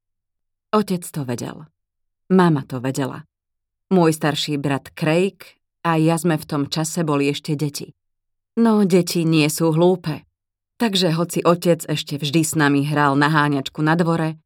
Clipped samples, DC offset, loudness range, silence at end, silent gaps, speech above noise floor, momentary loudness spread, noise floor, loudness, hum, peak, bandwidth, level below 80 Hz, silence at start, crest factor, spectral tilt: under 0.1%; under 0.1%; 4 LU; 0.1 s; none; 61 dB; 10 LU; -80 dBFS; -19 LUFS; none; -2 dBFS; 17.5 kHz; -64 dBFS; 0.75 s; 18 dB; -5.5 dB/octave